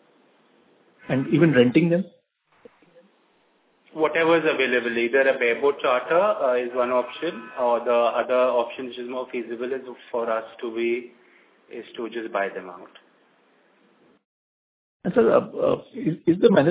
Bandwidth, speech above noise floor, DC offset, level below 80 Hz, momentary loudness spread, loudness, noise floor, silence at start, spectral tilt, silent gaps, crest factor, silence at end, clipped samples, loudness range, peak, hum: 4 kHz; 42 dB; under 0.1%; -66 dBFS; 14 LU; -23 LUFS; -64 dBFS; 1.05 s; -10.5 dB/octave; 14.25-15.00 s; 20 dB; 0 s; under 0.1%; 10 LU; -2 dBFS; none